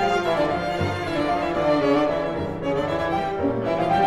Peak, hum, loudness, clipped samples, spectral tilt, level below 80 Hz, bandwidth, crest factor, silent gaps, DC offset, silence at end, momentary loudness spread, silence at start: -8 dBFS; none; -23 LUFS; under 0.1%; -6.5 dB/octave; -46 dBFS; 13.5 kHz; 14 dB; none; under 0.1%; 0 s; 5 LU; 0 s